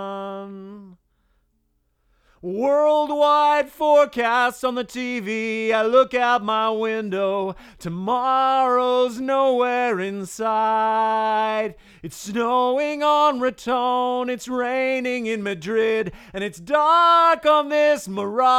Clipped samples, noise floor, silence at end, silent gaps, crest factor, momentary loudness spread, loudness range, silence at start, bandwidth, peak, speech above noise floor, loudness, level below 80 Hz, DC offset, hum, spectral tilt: under 0.1%; -68 dBFS; 0 s; none; 16 dB; 13 LU; 3 LU; 0 s; 15.5 kHz; -4 dBFS; 48 dB; -20 LUFS; -58 dBFS; under 0.1%; none; -4.5 dB/octave